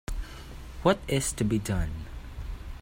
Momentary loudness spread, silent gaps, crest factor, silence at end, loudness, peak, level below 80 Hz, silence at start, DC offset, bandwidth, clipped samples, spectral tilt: 16 LU; none; 22 dB; 0 s; -29 LUFS; -10 dBFS; -38 dBFS; 0.1 s; under 0.1%; 16.5 kHz; under 0.1%; -5 dB/octave